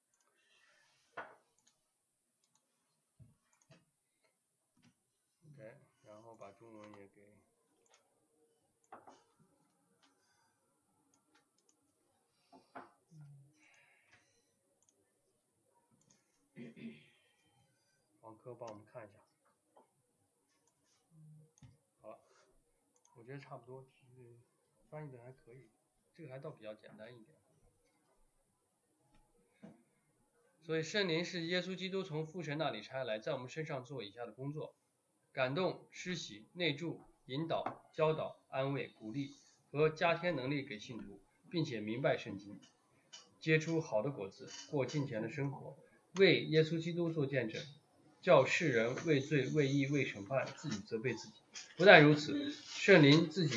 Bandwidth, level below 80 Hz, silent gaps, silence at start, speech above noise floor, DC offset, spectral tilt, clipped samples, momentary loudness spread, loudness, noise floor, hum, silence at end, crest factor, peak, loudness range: 11 kHz; -82 dBFS; none; 1.15 s; 48 dB; under 0.1%; -5.5 dB/octave; under 0.1%; 24 LU; -34 LUFS; -83 dBFS; none; 0 s; 32 dB; -8 dBFS; 25 LU